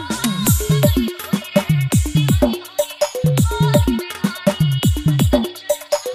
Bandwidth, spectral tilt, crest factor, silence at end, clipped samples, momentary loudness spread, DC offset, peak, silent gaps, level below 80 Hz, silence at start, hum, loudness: 15.5 kHz; -5.5 dB/octave; 16 dB; 0 s; under 0.1%; 6 LU; under 0.1%; 0 dBFS; none; -28 dBFS; 0 s; none; -18 LUFS